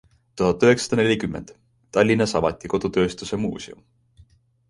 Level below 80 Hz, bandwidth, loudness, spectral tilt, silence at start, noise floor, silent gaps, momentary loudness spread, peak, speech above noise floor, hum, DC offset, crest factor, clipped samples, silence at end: -48 dBFS; 11.5 kHz; -21 LUFS; -5.5 dB/octave; 0.35 s; -55 dBFS; none; 12 LU; -4 dBFS; 34 dB; none; under 0.1%; 18 dB; under 0.1%; 0.95 s